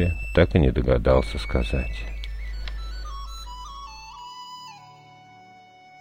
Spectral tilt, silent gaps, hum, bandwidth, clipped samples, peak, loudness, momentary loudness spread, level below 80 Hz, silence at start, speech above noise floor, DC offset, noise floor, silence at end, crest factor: -7 dB/octave; none; none; 15.5 kHz; under 0.1%; -4 dBFS; -24 LUFS; 20 LU; -30 dBFS; 0 s; 29 dB; under 0.1%; -49 dBFS; 0 s; 20 dB